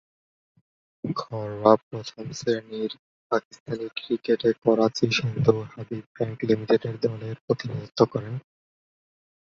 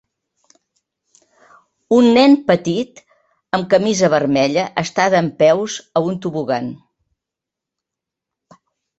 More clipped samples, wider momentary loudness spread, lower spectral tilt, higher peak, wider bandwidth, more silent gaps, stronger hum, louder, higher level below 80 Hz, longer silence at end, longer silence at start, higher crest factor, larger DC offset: neither; first, 14 LU vs 11 LU; first, -6.5 dB/octave vs -5 dB/octave; about the same, -2 dBFS vs 0 dBFS; second, 7.4 kHz vs 8.2 kHz; first, 1.83-1.91 s, 2.99-3.30 s, 3.45-3.51 s, 3.60-3.66 s, 6.06-6.15 s, 7.41-7.48 s vs none; neither; second, -26 LUFS vs -16 LUFS; about the same, -62 dBFS vs -60 dBFS; second, 1.05 s vs 2.25 s; second, 1.05 s vs 1.9 s; first, 24 dB vs 18 dB; neither